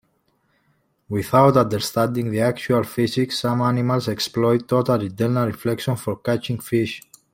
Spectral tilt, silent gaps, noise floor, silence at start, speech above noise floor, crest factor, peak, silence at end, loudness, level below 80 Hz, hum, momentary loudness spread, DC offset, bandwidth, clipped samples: -6 dB/octave; none; -66 dBFS; 1.1 s; 46 dB; 18 dB; -2 dBFS; 0.35 s; -21 LUFS; -56 dBFS; none; 8 LU; under 0.1%; 16.5 kHz; under 0.1%